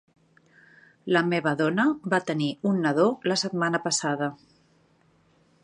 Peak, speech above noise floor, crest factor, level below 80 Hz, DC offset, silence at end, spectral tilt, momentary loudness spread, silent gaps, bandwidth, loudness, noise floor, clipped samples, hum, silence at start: -6 dBFS; 38 dB; 20 dB; -72 dBFS; under 0.1%; 1.3 s; -4.5 dB/octave; 6 LU; none; 11 kHz; -25 LUFS; -63 dBFS; under 0.1%; none; 1.05 s